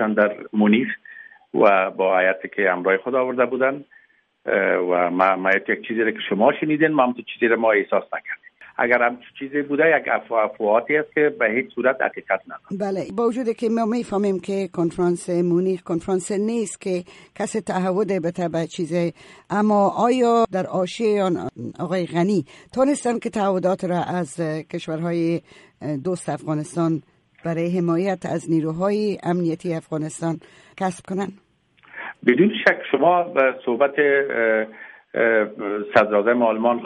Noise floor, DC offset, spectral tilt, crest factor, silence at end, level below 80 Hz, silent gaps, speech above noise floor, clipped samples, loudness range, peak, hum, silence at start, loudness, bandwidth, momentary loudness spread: -55 dBFS; under 0.1%; -6 dB/octave; 20 dB; 0 s; -64 dBFS; none; 34 dB; under 0.1%; 5 LU; -2 dBFS; none; 0 s; -21 LUFS; 11.5 kHz; 10 LU